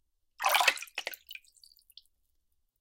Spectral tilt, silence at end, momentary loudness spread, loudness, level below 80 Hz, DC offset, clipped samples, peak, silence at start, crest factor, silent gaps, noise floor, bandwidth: 3 dB/octave; 1.45 s; 22 LU; -29 LUFS; -78 dBFS; under 0.1%; under 0.1%; -8 dBFS; 0.4 s; 28 dB; none; -75 dBFS; 17 kHz